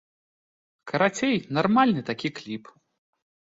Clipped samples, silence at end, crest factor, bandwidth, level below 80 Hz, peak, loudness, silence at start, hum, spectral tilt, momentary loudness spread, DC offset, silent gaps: under 0.1%; 1 s; 20 dB; 7.8 kHz; -66 dBFS; -8 dBFS; -24 LUFS; 0.85 s; none; -5.5 dB/octave; 16 LU; under 0.1%; none